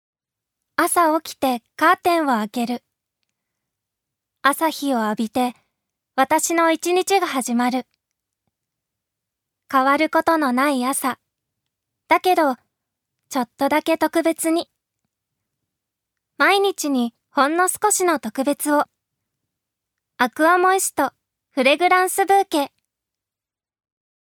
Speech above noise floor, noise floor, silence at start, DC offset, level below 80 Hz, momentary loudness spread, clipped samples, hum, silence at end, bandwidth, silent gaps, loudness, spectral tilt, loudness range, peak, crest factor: over 71 dB; under -90 dBFS; 0.8 s; under 0.1%; -70 dBFS; 10 LU; under 0.1%; none; 1.65 s; over 20 kHz; none; -19 LUFS; -2 dB/octave; 4 LU; -2 dBFS; 20 dB